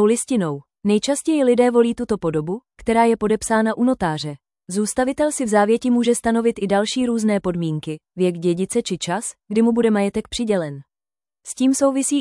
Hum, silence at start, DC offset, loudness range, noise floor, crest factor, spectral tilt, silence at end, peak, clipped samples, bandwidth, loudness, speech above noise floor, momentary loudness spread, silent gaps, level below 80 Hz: none; 0 s; under 0.1%; 2 LU; under -90 dBFS; 14 dB; -5 dB/octave; 0 s; -4 dBFS; under 0.1%; 12 kHz; -20 LUFS; over 71 dB; 9 LU; none; -52 dBFS